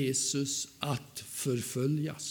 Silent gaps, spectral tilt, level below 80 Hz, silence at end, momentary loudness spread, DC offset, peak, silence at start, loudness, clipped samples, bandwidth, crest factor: none; -4 dB/octave; -70 dBFS; 0 s; 6 LU; under 0.1%; -14 dBFS; 0 s; -33 LUFS; under 0.1%; 19 kHz; 18 dB